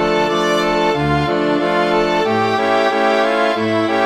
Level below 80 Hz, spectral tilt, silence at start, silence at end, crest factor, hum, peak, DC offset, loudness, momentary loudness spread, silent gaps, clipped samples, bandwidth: -42 dBFS; -5.5 dB/octave; 0 s; 0 s; 14 dB; none; -2 dBFS; 0.2%; -15 LUFS; 2 LU; none; under 0.1%; 15 kHz